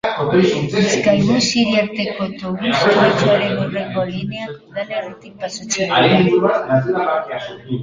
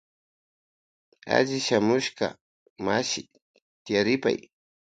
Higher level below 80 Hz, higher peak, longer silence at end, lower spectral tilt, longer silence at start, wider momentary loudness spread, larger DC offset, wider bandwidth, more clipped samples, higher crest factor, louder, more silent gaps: first, -50 dBFS vs -66 dBFS; first, -2 dBFS vs -6 dBFS; second, 0 s vs 0.45 s; about the same, -5 dB/octave vs -4 dB/octave; second, 0.05 s vs 1.25 s; first, 14 LU vs 10 LU; neither; about the same, 9.6 kHz vs 9.4 kHz; neither; second, 16 dB vs 22 dB; first, -16 LUFS vs -26 LUFS; second, none vs 2.41-2.76 s, 3.42-3.54 s, 3.62-3.85 s